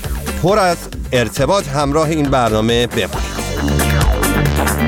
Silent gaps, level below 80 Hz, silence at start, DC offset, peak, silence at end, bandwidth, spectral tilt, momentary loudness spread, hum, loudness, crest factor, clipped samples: none; -24 dBFS; 0 s; under 0.1%; -2 dBFS; 0 s; 18 kHz; -5 dB/octave; 6 LU; none; -16 LUFS; 14 dB; under 0.1%